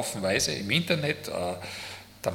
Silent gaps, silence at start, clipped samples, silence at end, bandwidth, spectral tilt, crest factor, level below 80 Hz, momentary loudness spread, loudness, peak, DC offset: none; 0 s; under 0.1%; 0 s; 18 kHz; -3.5 dB/octave; 22 dB; -60 dBFS; 12 LU; -28 LUFS; -8 dBFS; under 0.1%